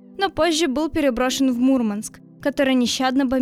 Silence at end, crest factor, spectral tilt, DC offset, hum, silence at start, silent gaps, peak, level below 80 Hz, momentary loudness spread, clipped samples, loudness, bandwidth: 0 s; 16 dB; -3.5 dB/octave; under 0.1%; none; 0.15 s; none; -6 dBFS; -46 dBFS; 7 LU; under 0.1%; -20 LUFS; 15 kHz